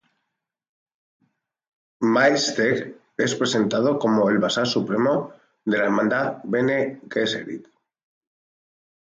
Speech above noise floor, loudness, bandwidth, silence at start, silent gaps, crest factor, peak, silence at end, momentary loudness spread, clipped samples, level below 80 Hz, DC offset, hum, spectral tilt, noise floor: 60 dB; -22 LUFS; 9.2 kHz; 2 s; none; 18 dB; -6 dBFS; 1.4 s; 9 LU; under 0.1%; -68 dBFS; under 0.1%; none; -4.5 dB/octave; -81 dBFS